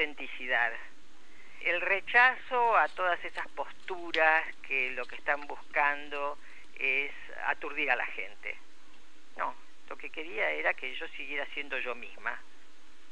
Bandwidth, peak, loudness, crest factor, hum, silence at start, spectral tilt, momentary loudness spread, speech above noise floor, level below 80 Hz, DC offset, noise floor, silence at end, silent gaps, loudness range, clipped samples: 10.5 kHz; -10 dBFS; -31 LUFS; 24 dB; none; 0 s; -3 dB/octave; 15 LU; 29 dB; -70 dBFS; 1%; -60 dBFS; 0.7 s; none; 8 LU; under 0.1%